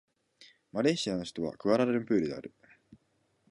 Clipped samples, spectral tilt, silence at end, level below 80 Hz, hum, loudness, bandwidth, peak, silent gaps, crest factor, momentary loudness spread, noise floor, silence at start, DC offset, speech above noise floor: under 0.1%; -5.5 dB/octave; 0.55 s; -68 dBFS; none; -31 LUFS; 11 kHz; -12 dBFS; none; 20 dB; 12 LU; -74 dBFS; 0.4 s; under 0.1%; 44 dB